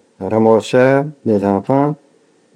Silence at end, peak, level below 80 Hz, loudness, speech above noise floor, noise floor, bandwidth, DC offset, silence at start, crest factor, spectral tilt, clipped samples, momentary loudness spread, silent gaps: 0.6 s; 0 dBFS; -66 dBFS; -15 LUFS; 40 dB; -53 dBFS; 11 kHz; under 0.1%; 0.2 s; 16 dB; -7.5 dB/octave; under 0.1%; 7 LU; none